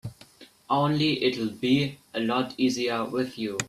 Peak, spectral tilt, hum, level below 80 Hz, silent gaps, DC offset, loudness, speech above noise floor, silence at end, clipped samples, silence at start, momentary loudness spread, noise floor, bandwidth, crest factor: -10 dBFS; -5 dB/octave; none; -64 dBFS; none; under 0.1%; -26 LUFS; 27 dB; 0 s; under 0.1%; 0.05 s; 6 LU; -53 dBFS; 14 kHz; 18 dB